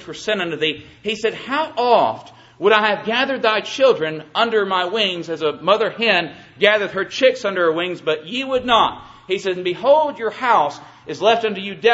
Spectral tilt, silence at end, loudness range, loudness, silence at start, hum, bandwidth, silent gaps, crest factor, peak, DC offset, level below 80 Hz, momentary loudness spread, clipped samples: -4 dB/octave; 0 s; 1 LU; -18 LUFS; 0 s; none; 8 kHz; none; 18 dB; 0 dBFS; under 0.1%; -60 dBFS; 8 LU; under 0.1%